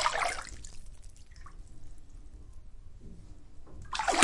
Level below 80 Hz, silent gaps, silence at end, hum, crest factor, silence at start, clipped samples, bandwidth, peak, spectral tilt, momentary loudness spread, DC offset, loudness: -48 dBFS; none; 0 s; none; 32 dB; 0 s; under 0.1%; 11.5 kHz; -4 dBFS; -2 dB/octave; 23 LU; under 0.1%; -34 LUFS